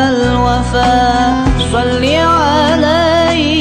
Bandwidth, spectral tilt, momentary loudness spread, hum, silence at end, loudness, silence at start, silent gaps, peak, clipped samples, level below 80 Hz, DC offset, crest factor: 11.5 kHz; -5.5 dB/octave; 3 LU; none; 0 s; -11 LUFS; 0 s; none; -2 dBFS; under 0.1%; -22 dBFS; under 0.1%; 8 dB